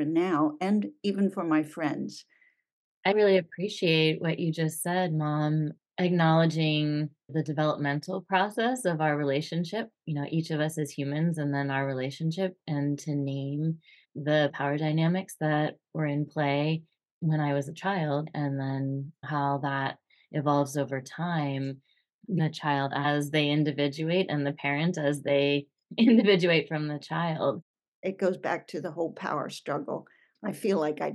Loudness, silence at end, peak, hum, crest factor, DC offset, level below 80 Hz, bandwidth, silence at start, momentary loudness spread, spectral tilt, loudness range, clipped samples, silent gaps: -28 LUFS; 0 s; -10 dBFS; none; 18 dB; under 0.1%; -84 dBFS; 12.5 kHz; 0 s; 10 LU; -6.5 dB/octave; 5 LU; under 0.1%; 2.72-3.03 s, 17.11-17.21 s, 22.14-22.19 s, 27.62-27.74 s, 27.88-28.03 s